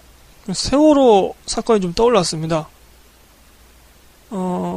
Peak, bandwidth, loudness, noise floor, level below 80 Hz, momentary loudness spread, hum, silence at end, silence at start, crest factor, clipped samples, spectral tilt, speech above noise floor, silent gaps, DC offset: -2 dBFS; 15 kHz; -16 LUFS; -48 dBFS; -42 dBFS; 15 LU; none; 0 s; 0.45 s; 16 dB; under 0.1%; -5 dB/octave; 33 dB; none; under 0.1%